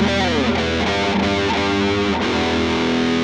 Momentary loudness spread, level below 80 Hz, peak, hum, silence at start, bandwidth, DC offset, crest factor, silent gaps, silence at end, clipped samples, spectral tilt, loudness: 1 LU; -36 dBFS; -6 dBFS; none; 0 s; 9.4 kHz; under 0.1%; 12 dB; none; 0 s; under 0.1%; -5 dB/octave; -18 LUFS